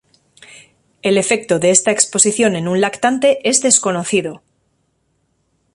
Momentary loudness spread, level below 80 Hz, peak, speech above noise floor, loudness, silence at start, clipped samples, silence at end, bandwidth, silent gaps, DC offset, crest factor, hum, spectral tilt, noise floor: 6 LU; -58 dBFS; 0 dBFS; 50 dB; -14 LUFS; 1.05 s; under 0.1%; 1.35 s; 11.5 kHz; none; under 0.1%; 18 dB; none; -3 dB/octave; -65 dBFS